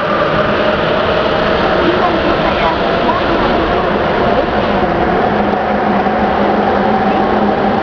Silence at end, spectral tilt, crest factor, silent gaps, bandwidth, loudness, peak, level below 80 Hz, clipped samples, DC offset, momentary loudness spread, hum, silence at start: 0 s; -7 dB/octave; 12 dB; none; 5.4 kHz; -13 LUFS; 0 dBFS; -30 dBFS; under 0.1%; under 0.1%; 1 LU; none; 0 s